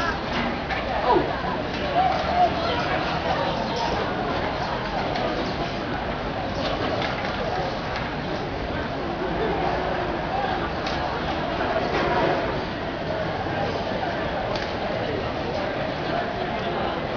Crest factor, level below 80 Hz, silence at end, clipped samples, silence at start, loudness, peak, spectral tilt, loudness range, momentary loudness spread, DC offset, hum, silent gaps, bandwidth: 18 dB; -40 dBFS; 0 s; under 0.1%; 0 s; -25 LUFS; -8 dBFS; -6 dB/octave; 3 LU; 6 LU; under 0.1%; none; none; 5.4 kHz